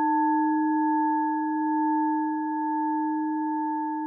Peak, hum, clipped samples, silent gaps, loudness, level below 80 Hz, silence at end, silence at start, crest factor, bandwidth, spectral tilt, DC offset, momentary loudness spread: -16 dBFS; none; under 0.1%; none; -26 LUFS; under -90 dBFS; 0 s; 0 s; 10 dB; 1.8 kHz; -10.5 dB/octave; under 0.1%; 5 LU